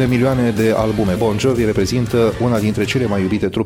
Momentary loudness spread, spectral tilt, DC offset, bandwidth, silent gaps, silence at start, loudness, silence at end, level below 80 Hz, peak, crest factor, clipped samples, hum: 2 LU; -6.5 dB/octave; under 0.1%; 17 kHz; none; 0 s; -16 LUFS; 0 s; -36 dBFS; -4 dBFS; 12 dB; under 0.1%; none